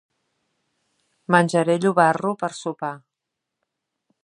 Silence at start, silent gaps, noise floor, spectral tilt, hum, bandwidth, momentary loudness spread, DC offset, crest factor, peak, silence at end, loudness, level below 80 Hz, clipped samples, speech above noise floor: 1.3 s; none; -83 dBFS; -6 dB/octave; none; 11.5 kHz; 14 LU; under 0.1%; 22 dB; -2 dBFS; 1.25 s; -21 LUFS; -74 dBFS; under 0.1%; 63 dB